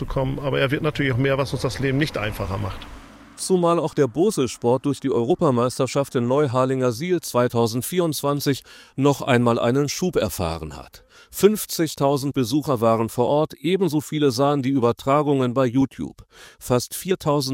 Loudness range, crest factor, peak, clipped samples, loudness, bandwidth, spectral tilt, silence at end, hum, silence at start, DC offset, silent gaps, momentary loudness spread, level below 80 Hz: 2 LU; 20 dB; -2 dBFS; under 0.1%; -21 LUFS; 16.5 kHz; -5.5 dB/octave; 0 s; none; 0 s; under 0.1%; none; 8 LU; -46 dBFS